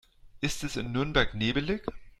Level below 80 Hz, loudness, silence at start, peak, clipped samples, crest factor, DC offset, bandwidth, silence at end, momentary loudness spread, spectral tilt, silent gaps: -42 dBFS; -30 LUFS; 0.25 s; -10 dBFS; under 0.1%; 20 dB; under 0.1%; 15 kHz; 0.1 s; 8 LU; -4.5 dB/octave; none